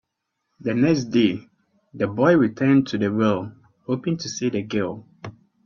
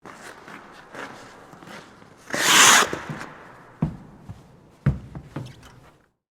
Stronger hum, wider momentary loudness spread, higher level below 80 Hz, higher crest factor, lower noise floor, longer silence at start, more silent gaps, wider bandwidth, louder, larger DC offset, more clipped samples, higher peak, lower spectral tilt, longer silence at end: neither; second, 19 LU vs 29 LU; second, -62 dBFS vs -46 dBFS; second, 18 dB vs 24 dB; first, -78 dBFS vs -55 dBFS; first, 0.6 s vs 0.05 s; neither; second, 7.4 kHz vs over 20 kHz; second, -22 LUFS vs -18 LUFS; neither; neither; second, -4 dBFS vs 0 dBFS; first, -6.5 dB/octave vs -1.5 dB/octave; second, 0.35 s vs 0.85 s